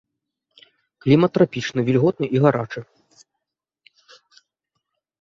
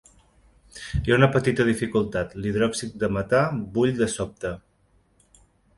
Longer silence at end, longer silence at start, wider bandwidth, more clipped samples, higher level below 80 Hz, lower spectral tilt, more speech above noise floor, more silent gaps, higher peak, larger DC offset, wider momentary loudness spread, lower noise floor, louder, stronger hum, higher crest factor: first, 2.35 s vs 1.2 s; first, 1.05 s vs 0.75 s; second, 7.6 kHz vs 11.5 kHz; neither; second, -60 dBFS vs -44 dBFS; first, -7.5 dB/octave vs -6 dB/octave; first, 64 dB vs 40 dB; neither; about the same, -2 dBFS vs -4 dBFS; neither; about the same, 11 LU vs 12 LU; first, -82 dBFS vs -63 dBFS; first, -19 LUFS vs -24 LUFS; neither; about the same, 22 dB vs 22 dB